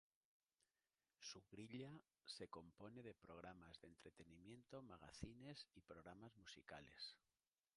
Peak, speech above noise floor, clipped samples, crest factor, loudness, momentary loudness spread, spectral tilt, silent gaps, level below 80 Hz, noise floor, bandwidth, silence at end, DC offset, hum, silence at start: -36 dBFS; over 29 dB; under 0.1%; 26 dB; -60 LUFS; 7 LU; -4.5 dB/octave; none; -78 dBFS; under -90 dBFS; 11 kHz; 0.6 s; under 0.1%; none; 1.2 s